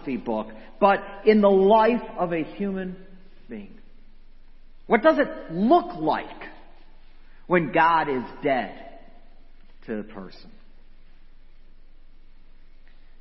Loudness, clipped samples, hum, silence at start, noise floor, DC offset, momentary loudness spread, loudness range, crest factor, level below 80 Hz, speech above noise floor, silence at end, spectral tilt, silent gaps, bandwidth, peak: -22 LUFS; under 0.1%; none; 0 s; -44 dBFS; under 0.1%; 23 LU; 20 LU; 22 dB; -46 dBFS; 22 dB; 1.35 s; -9.5 dB/octave; none; 6 kHz; -4 dBFS